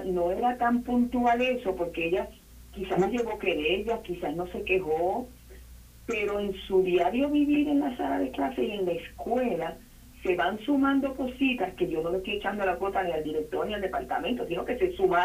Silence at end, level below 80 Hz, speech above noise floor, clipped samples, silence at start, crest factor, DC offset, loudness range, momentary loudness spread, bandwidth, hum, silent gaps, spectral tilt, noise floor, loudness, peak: 0 s; -50 dBFS; 21 dB; under 0.1%; 0 s; 16 dB; under 0.1%; 3 LU; 8 LU; 15.5 kHz; none; none; -6 dB/octave; -49 dBFS; -28 LUFS; -12 dBFS